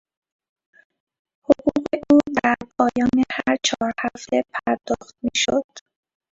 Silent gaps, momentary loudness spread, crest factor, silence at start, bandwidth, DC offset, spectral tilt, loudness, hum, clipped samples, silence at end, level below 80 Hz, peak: 5.64-5.69 s; 9 LU; 22 dB; 1.5 s; 8 kHz; under 0.1%; -3.5 dB/octave; -21 LUFS; none; under 0.1%; 0.55 s; -54 dBFS; 0 dBFS